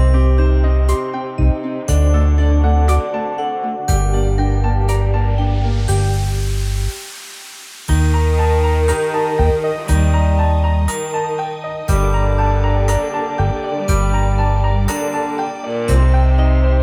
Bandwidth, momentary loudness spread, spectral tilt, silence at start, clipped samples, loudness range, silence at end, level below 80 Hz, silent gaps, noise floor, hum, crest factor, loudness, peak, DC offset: 16.5 kHz; 8 LU; -6.5 dB/octave; 0 s; under 0.1%; 2 LU; 0 s; -18 dBFS; none; -36 dBFS; none; 12 dB; -17 LUFS; -2 dBFS; under 0.1%